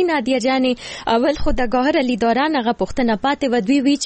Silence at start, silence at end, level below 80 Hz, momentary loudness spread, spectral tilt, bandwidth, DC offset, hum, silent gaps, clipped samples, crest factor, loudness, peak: 0 s; 0 s; -34 dBFS; 4 LU; -4.5 dB/octave; 8.6 kHz; under 0.1%; none; none; under 0.1%; 10 dB; -18 LUFS; -6 dBFS